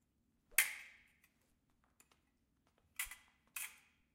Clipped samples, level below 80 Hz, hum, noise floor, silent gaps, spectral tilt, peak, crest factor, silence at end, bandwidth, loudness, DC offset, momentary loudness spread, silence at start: under 0.1%; -74 dBFS; none; -80 dBFS; none; 2.5 dB/octave; -14 dBFS; 34 dB; 0.4 s; 16.5 kHz; -40 LUFS; under 0.1%; 19 LU; 0.5 s